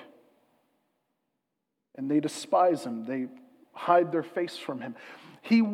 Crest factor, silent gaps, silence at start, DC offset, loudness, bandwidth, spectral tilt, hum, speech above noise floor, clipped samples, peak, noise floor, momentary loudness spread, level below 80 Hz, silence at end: 22 dB; none; 0 s; under 0.1%; -28 LUFS; 13 kHz; -5.5 dB/octave; none; 56 dB; under 0.1%; -8 dBFS; -83 dBFS; 17 LU; under -90 dBFS; 0 s